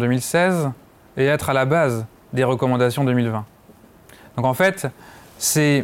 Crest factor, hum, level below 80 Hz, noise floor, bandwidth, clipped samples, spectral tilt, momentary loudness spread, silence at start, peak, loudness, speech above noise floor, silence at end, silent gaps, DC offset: 14 dB; none; -56 dBFS; -49 dBFS; 17 kHz; under 0.1%; -5 dB/octave; 12 LU; 0 s; -6 dBFS; -20 LUFS; 30 dB; 0 s; none; under 0.1%